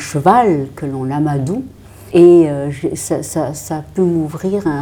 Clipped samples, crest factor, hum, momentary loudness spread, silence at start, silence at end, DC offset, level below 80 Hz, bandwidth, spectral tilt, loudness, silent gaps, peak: under 0.1%; 14 dB; none; 14 LU; 0 s; 0 s; under 0.1%; -44 dBFS; 17 kHz; -7 dB/octave; -15 LUFS; none; 0 dBFS